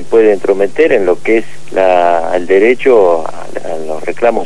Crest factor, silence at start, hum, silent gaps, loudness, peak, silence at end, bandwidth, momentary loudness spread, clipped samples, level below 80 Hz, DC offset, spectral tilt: 12 dB; 0 s; none; none; -11 LUFS; 0 dBFS; 0 s; 11 kHz; 12 LU; 1%; -48 dBFS; 10%; -5.5 dB/octave